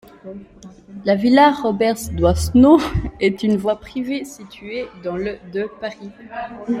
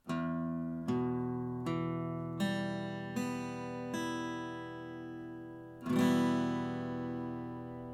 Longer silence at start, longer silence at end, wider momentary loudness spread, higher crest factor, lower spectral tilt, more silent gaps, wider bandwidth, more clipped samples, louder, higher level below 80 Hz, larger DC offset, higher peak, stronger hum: first, 0.25 s vs 0.05 s; about the same, 0 s vs 0 s; first, 23 LU vs 13 LU; about the same, 16 dB vs 18 dB; about the same, -6 dB/octave vs -6.5 dB/octave; neither; first, 16 kHz vs 14.5 kHz; neither; first, -18 LUFS vs -37 LUFS; first, -36 dBFS vs -66 dBFS; neither; first, -2 dBFS vs -18 dBFS; neither